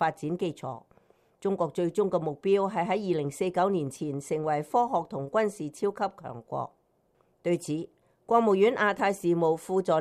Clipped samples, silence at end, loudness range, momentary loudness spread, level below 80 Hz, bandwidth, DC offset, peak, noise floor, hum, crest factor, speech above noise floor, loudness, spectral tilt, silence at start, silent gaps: under 0.1%; 0 s; 4 LU; 12 LU; -70 dBFS; 14 kHz; under 0.1%; -10 dBFS; -69 dBFS; none; 18 dB; 41 dB; -28 LUFS; -6 dB/octave; 0 s; none